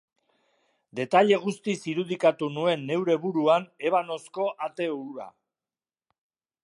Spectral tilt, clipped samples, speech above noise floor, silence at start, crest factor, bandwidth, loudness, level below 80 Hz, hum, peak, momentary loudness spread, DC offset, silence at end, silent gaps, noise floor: -5.5 dB/octave; under 0.1%; over 64 dB; 0.95 s; 20 dB; 11.5 kHz; -26 LUFS; -82 dBFS; none; -8 dBFS; 13 LU; under 0.1%; 1.35 s; none; under -90 dBFS